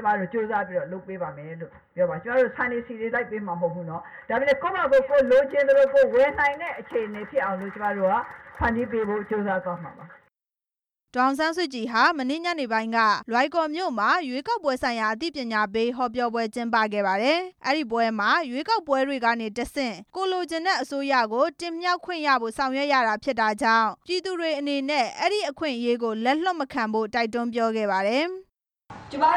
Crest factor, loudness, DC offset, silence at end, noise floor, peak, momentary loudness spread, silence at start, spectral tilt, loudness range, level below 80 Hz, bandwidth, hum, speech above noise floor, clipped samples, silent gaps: 18 dB; -24 LUFS; under 0.1%; 0 s; under -90 dBFS; -6 dBFS; 9 LU; 0 s; -4.5 dB/octave; 6 LU; -56 dBFS; 13 kHz; none; over 66 dB; under 0.1%; none